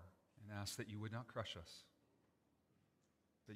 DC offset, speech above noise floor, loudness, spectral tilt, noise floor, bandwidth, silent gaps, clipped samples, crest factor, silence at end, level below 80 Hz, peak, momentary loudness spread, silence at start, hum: under 0.1%; 31 dB; -50 LUFS; -4.5 dB/octave; -81 dBFS; 15.5 kHz; none; under 0.1%; 24 dB; 0 s; -80 dBFS; -30 dBFS; 14 LU; 0 s; none